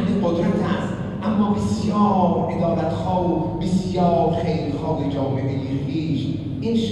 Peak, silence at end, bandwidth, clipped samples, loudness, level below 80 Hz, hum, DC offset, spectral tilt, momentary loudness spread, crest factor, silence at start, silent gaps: -6 dBFS; 0 s; 11 kHz; under 0.1%; -21 LUFS; -42 dBFS; none; under 0.1%; -8 dB/octave; 6 LU; 14 dB; 0 s; none